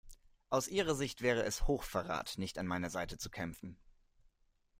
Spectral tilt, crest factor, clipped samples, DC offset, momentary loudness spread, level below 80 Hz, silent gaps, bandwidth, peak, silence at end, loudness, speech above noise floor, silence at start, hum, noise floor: -4 dB/octave; 20 dB; under 0.1%; under 0.1%; 9 LU; -48 dBFS; none; 16 kHz; -18 dBFS; 1.05 s; -37 LUFS; 36 dB; 0.05 s; none; -73 dBFS